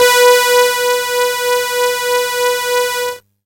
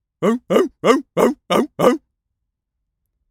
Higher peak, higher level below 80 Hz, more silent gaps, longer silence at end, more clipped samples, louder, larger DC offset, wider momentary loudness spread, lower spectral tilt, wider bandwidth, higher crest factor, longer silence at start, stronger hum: about the same, 0 dBFS vs 0 dBFS; about the same, -62 dBFS vs -58 dBFS; neither; second, 0.25 s vs 1.35 s; neither; first, -13 LUFS vs -18 LUFS; neither; about the same, 7 LU vs 5 LU; second, 1.5 dB/octave vs -5.5 dB/octave; about the same, 17 kHz vs 17.5 kHz; about the same, 14 dB vs 18 dB; second, 0 s vs 0.2 s; neither